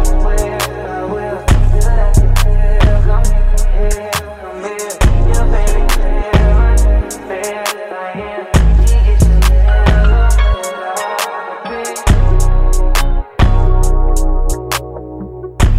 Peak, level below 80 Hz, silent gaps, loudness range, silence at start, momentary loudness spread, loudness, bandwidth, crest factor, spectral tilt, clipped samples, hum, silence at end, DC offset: 0 dBFS; -10 dBFS; none; 3 LU; 0 s; 11 LU; -15 LUFS; 15.5 kHz; 10 dB; -5.5 dB/octave; under 0.1%; none; 0 s; under 0.1%